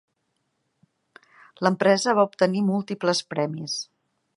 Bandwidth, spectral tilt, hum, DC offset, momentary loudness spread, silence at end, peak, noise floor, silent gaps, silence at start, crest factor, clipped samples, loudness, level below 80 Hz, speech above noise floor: 11.5 kHz; -5 dB/octave; none; under 0.1%; 10 LU; 0.55 s; -4 dBFS; -75 dBFS; none; 1.6 s; 22 dB; under 0.1%; -23 LUFS; -74 dBFS; 52 dB